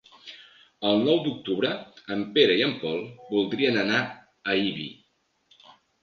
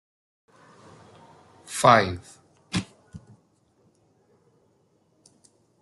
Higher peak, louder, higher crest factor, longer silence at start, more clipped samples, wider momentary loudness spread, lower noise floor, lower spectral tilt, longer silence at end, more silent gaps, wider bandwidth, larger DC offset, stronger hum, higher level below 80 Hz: second, -6 dBFS vs -2 dBFS; second, -25 LUFS vs -22 LUFS; about the same, 22 dB vs 26 dB; second, 0.25 s vs 1.7 s; neither; second, 15 LU vs 30 LU; first, -70 dBFS vs -66 dBFS; about the same, -5.5 dB/octave vs -4.5 dB/octave; second, 1.1 s vs 2.65 s; neither; second, 6.8 kHz vs 12.5 kHz; neither; neither; about the same, -68 dBFS vs -64 dBFS